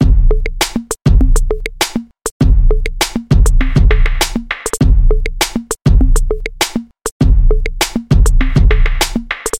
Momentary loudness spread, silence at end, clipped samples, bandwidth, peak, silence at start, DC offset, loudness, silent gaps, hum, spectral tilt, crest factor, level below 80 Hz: 5 LU; 0 s; under 0.1%; 16 kHz; 0 dBFS; 0 s; under 0.1%; -15 LUFS; 2.31-2.40 s, 7.11-7.20 s; none; -5 dB/octave; 10 dB; -12 dBFS